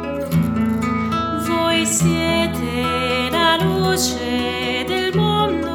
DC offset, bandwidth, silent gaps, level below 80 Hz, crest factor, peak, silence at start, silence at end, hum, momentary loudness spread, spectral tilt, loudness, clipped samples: under 0.1%; 19 kHz; none; -40 dBFS; 16 dB; -2 dBFS; 0 s; 0 s; none; 5 LU; -4.5 dB/octave; -18 LUFS; under 0.1%